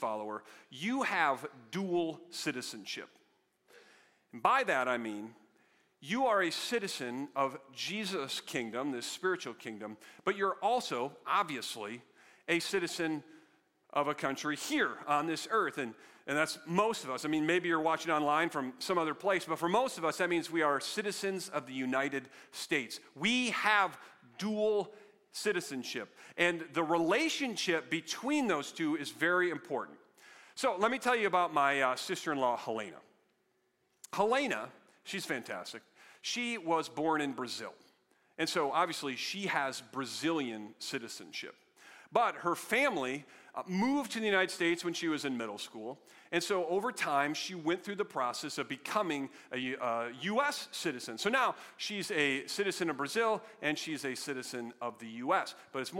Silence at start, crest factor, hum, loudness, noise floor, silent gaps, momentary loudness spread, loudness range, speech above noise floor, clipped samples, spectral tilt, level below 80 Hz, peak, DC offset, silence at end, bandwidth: 0 s; 22 dB; none; -34 LUFS; -76 dBFS; none; 12 LU; 4 LU; 42 dB; under 0.1%; -3.5 dB/octave; -82 dBFS; -12 dBFS; under 0.1%; 0 s; 16.5 kHz